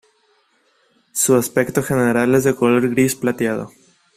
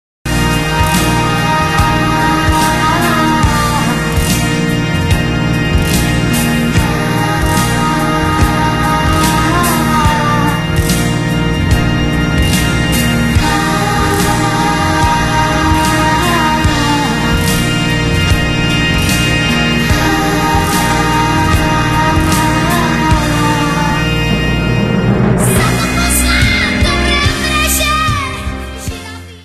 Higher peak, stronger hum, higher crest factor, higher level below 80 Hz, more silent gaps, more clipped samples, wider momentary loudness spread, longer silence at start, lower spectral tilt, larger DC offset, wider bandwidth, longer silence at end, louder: about the same, -2 dBFS vs 0 dBFS; neither; about the same, 16 dB vs 12 dB; second, -54 dBFS vs -22 dBFS; neither; neither; first, 8 LU vs 2 LU; first, 1.15 s vs 0.25 s; about the same, -5 dB/octave vs -4.5 dB/octave; neither; first, 16 kHz vs 13.5 kHz; first, 0.5 s vs 0 s; second, -17 LUFS vs -12 LUFS